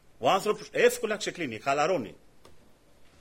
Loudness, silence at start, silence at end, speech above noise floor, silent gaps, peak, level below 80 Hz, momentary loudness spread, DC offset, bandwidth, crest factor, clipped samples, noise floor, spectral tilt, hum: -28 LUFS; 0.2 s; 0.15 s; 28 dB; none; -10 dBFS; -64 dBFS; 8 LU; under 0.1%; 16 kHz; 20 dB; under 0.1%; -56 dBFS; -3.5 dB/octave; none